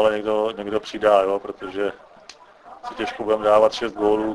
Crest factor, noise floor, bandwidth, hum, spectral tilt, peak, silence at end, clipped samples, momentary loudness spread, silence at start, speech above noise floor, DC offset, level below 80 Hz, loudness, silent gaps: 18 dB; -47 dBFS; 11 kHz; none; -5 dB/octave; -2 dBFS; 0 s; under 0.1%; 12 LU; 0 s; 26 dB; under 0.1%; -54 dBFS; -21 LUFS; none